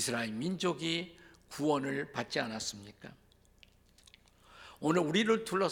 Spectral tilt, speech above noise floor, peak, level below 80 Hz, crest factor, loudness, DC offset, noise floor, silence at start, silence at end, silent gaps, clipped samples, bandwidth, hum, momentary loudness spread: -4 dB/octave; 30 dB; -14 dBFS; -68 dBFS; 22 dB; -33 LUFS; under 0.1%; -64 dBFS; 0 s; 0 s; none; under 0.1%; 18 kHz; none; 22 LU